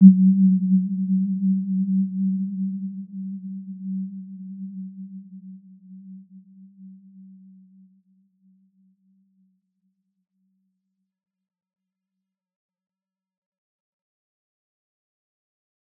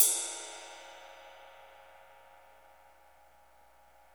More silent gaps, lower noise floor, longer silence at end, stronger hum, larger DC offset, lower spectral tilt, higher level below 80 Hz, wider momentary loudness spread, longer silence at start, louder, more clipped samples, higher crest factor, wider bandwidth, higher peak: neither; first, -85 dBFS vs -63 dBFS; first, 8.75 s vs 2.5 s; second, none vs 60 Hz at -75 dBFS; neither; first, -19.5 dB/octave vs 2 dB/octave; second, -86 dBFS vs -76 dBFS; about the same, 25 LU vs 24 LU; about the same, 0 s vs 0 s; first, -23 LUFS vs -33 LUFS; neither; second, 24 dB vs 30 dB; second, 0.3 kHz vs over 20 kHz; first, -2 dBFS vs -8 dBFS